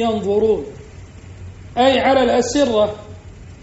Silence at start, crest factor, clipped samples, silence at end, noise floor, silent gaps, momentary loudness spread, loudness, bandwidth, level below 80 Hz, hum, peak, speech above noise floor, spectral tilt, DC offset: 0 s; 16 dB; under 0.1%; 0.05 s; -37 dBFS; none; 23 LU; -17 LUFS; 8 kHz; -42 dBFS; none; -2 dBFS; 22 dB; -3.5 dB/octave; under 0.1%